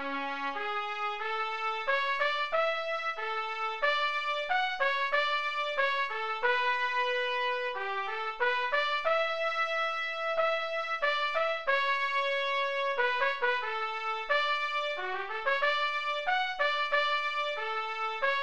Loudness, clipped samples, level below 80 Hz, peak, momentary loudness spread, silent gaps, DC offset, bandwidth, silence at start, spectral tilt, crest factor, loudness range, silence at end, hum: -30 LUFS; under 0.1%; -70 dBFS; -16 dBFS; 5 LU; none; 0.5%; 9 kHz; 0 s; -1 dB/octave; 16 dB; 1 LU; 0 s; none